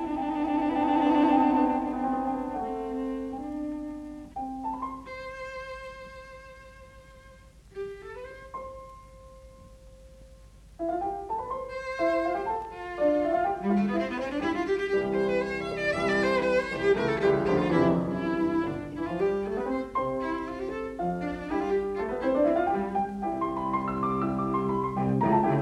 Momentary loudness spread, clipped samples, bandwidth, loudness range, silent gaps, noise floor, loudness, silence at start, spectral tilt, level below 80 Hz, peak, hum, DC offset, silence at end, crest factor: 16 LU; under 0.1%; 12 kHz; 17 LU; none; -52 dBFS; -28 LUFS; 0 s; -7.5 dB/octave; -52 dBFS; -10 dBFS; none; under 0.1%; 0 s; 18 dB